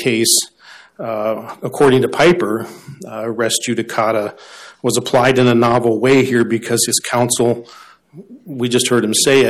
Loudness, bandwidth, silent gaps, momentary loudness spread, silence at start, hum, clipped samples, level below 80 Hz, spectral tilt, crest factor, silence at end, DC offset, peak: -15 LUFS; 15 kHz; none; 14 LU; 0 s; none; under 0.1%; -52 dBFS; -3.5 dB/octave; 14 dB; 0 s; under 0.1%; -2 dBFS